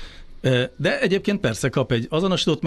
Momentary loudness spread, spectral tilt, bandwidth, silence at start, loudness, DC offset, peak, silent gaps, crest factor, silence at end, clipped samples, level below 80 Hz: 3 LU; -5.5 dB/octave; 12 kHz; 0 s; -22 LUFS; under 0.1%; -8 dBFS; none; 14 dB; 0 s; under 0.1%; -44 dBFS